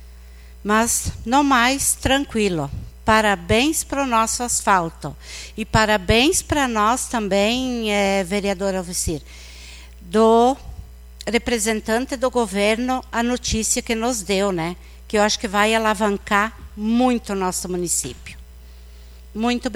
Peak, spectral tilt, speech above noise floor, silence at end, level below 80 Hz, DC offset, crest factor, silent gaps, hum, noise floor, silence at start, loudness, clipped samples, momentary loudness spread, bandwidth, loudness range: -2 dBFS; -3.5 dB/octave; 21 dB; 0 s; -38 dBFS; under 0.1%; 18 dB; none; 60 Hz at -40 dBFS; -41 dBFS; 0 s; -19 LUFS; under 0.1%; 14 LU; 16.5 kHz; 3 LU